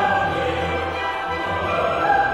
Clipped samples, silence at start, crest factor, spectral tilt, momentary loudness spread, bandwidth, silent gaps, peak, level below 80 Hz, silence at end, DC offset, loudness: under 0.1%; 0 s; 14 dB; -5.5 dB/octave; 5 LU; 13 kHz; none; -6 dBFS; -42 dBFS; 0 s; under 0.1%; -22 LUFS